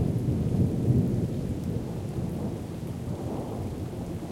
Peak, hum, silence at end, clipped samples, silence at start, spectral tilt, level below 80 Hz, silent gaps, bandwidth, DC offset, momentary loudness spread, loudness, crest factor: -12 dBFS; none; 0 s; under 0.1%; 0 s; -8.5 dB/octave; -44 dBFS; none; 16 kHz; under 0.1%; 10 LU; -30 LUFS; 18 dB